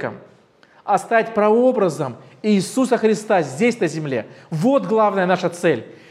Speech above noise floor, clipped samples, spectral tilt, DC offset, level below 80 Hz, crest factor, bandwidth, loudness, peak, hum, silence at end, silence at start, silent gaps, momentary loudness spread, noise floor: 34 dB; under 0.1%; -6 dB/octave; under 0.1%; -74 dBFS; 16 dB; 14 kHz; -19 LUFS; -2 dBFS; none; 0.2 s; 0 s; none; 11 LU; -52 dBFS